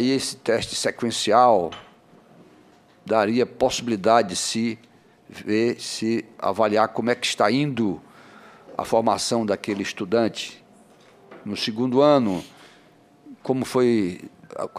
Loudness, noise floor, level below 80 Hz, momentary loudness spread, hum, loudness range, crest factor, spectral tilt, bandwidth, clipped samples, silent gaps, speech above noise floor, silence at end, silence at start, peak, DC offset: -22 LUFS; -54 dBFS; -60 dBFS; 15 LU; none; 3 LU; 20 dB; -4.5 dB/octave; 15.5 kHz; under 0.1%; none; 32 dB; 0 s; 0 s; -4 dBFS; under 0.1%